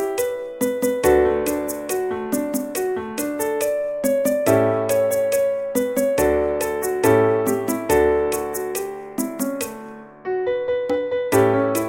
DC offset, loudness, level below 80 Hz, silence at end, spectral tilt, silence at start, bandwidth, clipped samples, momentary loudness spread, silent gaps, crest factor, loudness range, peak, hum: under 0.1%; -21 LUFS; -44 dBFS; 0 s; -5 dB/octave; 0 s; 17 kHz; under 0.1%; 9 LU; none; 16 dB; 4 LU; -4 dBFS; none